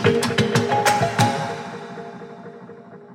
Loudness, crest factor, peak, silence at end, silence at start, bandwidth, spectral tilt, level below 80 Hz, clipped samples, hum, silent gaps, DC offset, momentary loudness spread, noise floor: -20 LUFS; 20 dB; -2 dBFS; 0 s; 0 s; 16.5 kHz; -4.5 dB/octave; -54 dBFS; under 0.1%; none; none; under 0.1%; 21 LU; -41 dBFS